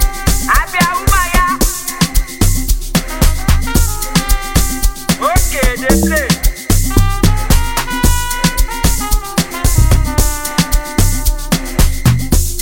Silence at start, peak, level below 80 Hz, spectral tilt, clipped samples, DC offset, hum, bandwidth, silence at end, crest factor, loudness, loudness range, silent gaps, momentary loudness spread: 0 s; 0 dBFS; -14 dBFS; -4 dB/octave; under 0.1%; under 0.1%; none; 17 kHz; 0 s; 12 dB; -14 LUFS; 1 LU; none; 4 LU